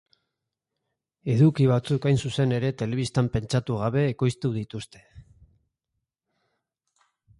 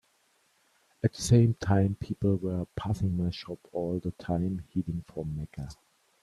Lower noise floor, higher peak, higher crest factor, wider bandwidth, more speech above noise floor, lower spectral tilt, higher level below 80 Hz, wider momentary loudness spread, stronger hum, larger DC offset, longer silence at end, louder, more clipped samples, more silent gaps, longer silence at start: first, -84 dBFS vs -69 dBFS; about the same, -10 dBFS vs -10 dBFS; about the same, 18 dB vs 20 dB; about the same, 11.5 kHz vs 12.5 kHz; first, 60 dB vs 40 dB; about the same, -7 dB/octave vs -7 dB/octave; about the same, -54 dBFS vs -52 dBFS; about the same, 12 LU vs 14 LU; neither; neither; first, 2.2 s vs 0.5 s; first, -24 LUFS vs -30 LUFS; neither; neither; first, 1.25 s vs 1.05 s